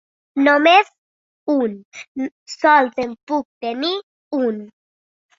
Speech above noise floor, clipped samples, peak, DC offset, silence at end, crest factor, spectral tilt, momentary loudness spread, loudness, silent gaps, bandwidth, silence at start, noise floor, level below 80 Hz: over 72 dB; under 0.1%; -2 dBFS; under 0.1%; 0.7 s; 18 dB; -4 dB/octave; 16 LU; -18 LUFS; 0.98-1.46 s, 1.85-1.91 s, 2.08-2.15 s, 2.32-2.46 s, 3.23-3.27 s, 3.45-3.61 s, 4.03-4.31 s; 7.6 kHz; 0.35 s; under -90 dBFS; -66 dBFS